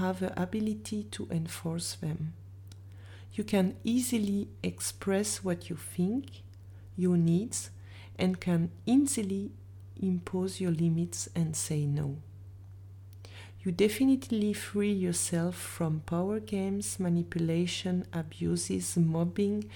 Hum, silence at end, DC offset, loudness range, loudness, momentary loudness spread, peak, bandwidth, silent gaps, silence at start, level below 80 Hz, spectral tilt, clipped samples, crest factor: none; 0 s; under 0.1%; 3 LU; -31 LUFS; 21 LU; -14 dBFS; 19 kHz; none; 0 s; -60 dBFS; -5.5 dB/octave; under 0.1%; 18 dB